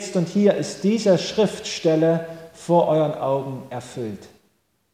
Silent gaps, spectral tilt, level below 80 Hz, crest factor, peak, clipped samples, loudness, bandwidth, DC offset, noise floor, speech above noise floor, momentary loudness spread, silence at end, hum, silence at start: none; -6 dB/octave; -62 dBFS; 16 dB; -6 dBFS; under 0.1%; -21 LUFS; 15 kHz; under 0.1%; -66 dBFS; 45 dB; 14 LU; 0.65 s; none; 0 s